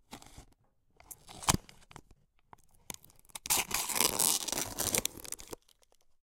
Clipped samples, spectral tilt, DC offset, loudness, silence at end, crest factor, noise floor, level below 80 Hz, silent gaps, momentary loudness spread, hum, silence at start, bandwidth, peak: under 0.1%; -1 dB/octave; under 0.1%; -31 LUFS; 0.65 s; 34 dB; -69 dBFS; -56 dBFS; none; 23 LU; none; 0.1 s; 17 kHz; -2 dBFS